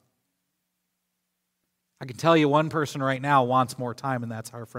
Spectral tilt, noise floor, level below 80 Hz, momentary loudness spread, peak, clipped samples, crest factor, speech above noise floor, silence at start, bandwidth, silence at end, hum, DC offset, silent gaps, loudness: -6 dB/octave; -79 dBFS; -72 dBFS; 16 LU; -6 dBFS; under 0.1%; 20 dB; 55 dB; 2 s; 16 kHz; 0 s; none; under 0.1%; none; -24 LUFS